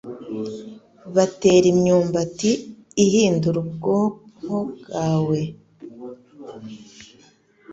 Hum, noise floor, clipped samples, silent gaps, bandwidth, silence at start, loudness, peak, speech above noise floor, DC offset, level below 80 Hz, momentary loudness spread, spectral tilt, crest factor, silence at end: none; -55 dBFS; under 0.1%; none; 8 kHz; 0.05 s; -21 LUFS; -4 dBFS; 36 dB; under 0.1%; -56 dBFS; 23 LU; -6 dB/octave; 18 dB; 0 s